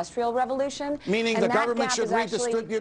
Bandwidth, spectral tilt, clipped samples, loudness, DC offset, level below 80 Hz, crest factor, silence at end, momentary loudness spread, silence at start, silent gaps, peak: 10.5 kHz; -3.5 dB/octave; under 0.1%; -25 LUFS; under 0.1%; -62 dBFS; 16 dB; 0 s; 5 LU; 0 s; none; -8 dBFS